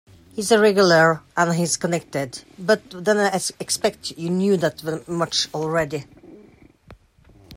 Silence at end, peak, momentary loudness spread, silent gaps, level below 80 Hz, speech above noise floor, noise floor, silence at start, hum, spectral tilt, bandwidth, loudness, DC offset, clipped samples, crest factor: 0 s; -4 dBFS; 13 LU; none; -58 dBFS; 32 dB; -52 dBFS; 0.35 s; none; -4 dB/octave; 16 kHz; -21 LUFS; under 0.1%; under 0.1%; 18 dB